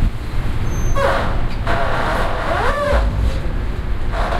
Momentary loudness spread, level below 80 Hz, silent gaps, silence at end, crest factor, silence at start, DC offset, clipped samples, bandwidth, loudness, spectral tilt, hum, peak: 7 LU; -20 dBFS; none; 0 s; 12 dB; 0 s; under 0.1%; under 0.1%; 13.5 kHz; -20 LUFS; -6 dB/octave; none; -4 dBFS